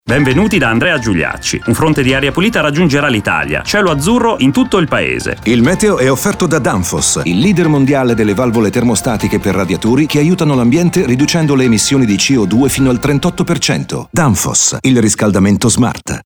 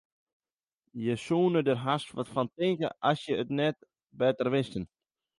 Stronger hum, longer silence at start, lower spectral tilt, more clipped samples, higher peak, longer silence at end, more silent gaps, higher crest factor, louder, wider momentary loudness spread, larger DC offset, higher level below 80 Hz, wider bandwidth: neither; second, 0.05 s vs 0.95 s; second, -4.5 dB/octave vs -6.5 dB/octave; neither; first, 0 dBFS vs -12 dBFS; second, 0.05 s vs 0.55 s; neither; second, 10 dB vs 18 dB; first, -11 LUFS vs -30 LUFS; second, 4 LU vs 10 LU; neither; first, -34 dBFS vs -66 dBFS; first, over 20 kHz vs 11.5 kHz